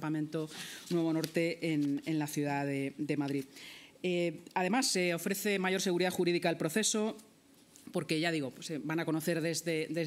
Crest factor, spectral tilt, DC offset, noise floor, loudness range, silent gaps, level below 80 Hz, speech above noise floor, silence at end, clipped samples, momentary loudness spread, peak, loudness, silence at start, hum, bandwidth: 18 dB; -4.5 dB/octave; under 0.1%; -61 dBFS; 3 LU; none; -82 dBFS; 28 dB; 0 s; under 0.1%; 9 LU; -16 dBFS; -33 LUFS; 0 s; none; 16 kHz